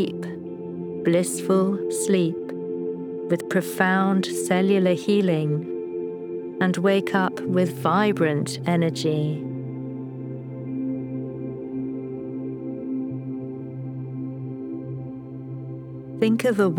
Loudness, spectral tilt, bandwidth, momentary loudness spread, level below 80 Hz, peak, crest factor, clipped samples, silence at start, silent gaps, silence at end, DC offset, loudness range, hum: -25 LUFS; -6 dB/octave; 19.5 kHz; 13 LU; -66 dBFS; -2 dBFS; 22 dB; under 0.1%; 0 s; none; 0 s; under 0.1%; 9 LU; none